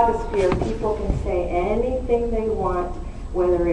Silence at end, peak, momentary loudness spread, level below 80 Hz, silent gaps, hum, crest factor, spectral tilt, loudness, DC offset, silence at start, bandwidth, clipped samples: 0 s; -6 dBFS; 6 LU; -30 dBFS; none; none; 16 dB; -8 dB/octave; -23 LUFS; under 0.1%; 0 s; 10 kHz; under 0.1%